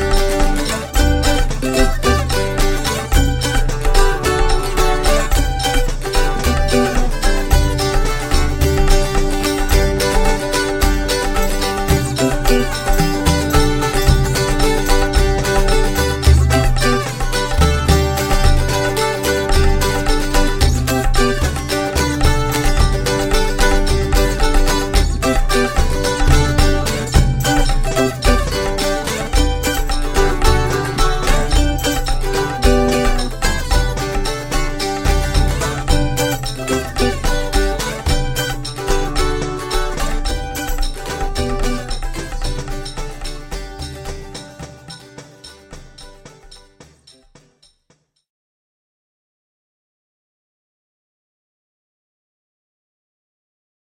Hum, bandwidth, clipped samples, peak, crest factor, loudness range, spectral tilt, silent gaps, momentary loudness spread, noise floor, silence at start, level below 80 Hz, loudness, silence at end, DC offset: none; 17 kHz; under 0.1%; 0 dBFS; 16 dB; 8 LU; -4.5 dB/octave; none; 8 LU; -61 dBFS; 0 s; -18 dBFS; -17 LUFS; 7.4 s; under 0.1%